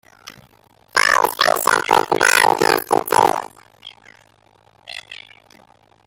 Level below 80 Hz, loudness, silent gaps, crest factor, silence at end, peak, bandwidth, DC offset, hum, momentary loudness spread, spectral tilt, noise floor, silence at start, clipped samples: -60 dBFS; -16 LUFS; none; 20 dB; 0.9 s; 0 dBFS; 17 kHz; under 0.1%; none; 21 LU; -1.5 dB/octave; -55 dBFS; 0.25 s; under 0.1%